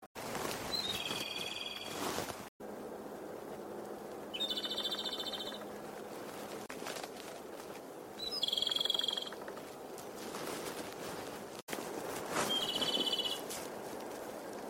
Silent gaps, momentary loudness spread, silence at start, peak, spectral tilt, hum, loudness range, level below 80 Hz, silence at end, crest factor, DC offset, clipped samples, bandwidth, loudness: 0.06-0.15 s, 2.48-2.60 s, 11.62-11.68 s; 14 LU; 0 s; -20 dBFS; -2 dB/octave; none; 6 LU; -70 dBFS; 0 s; 20 dB; under 0.1%; under 0.1%; 16.5 kHz; -38 LUFS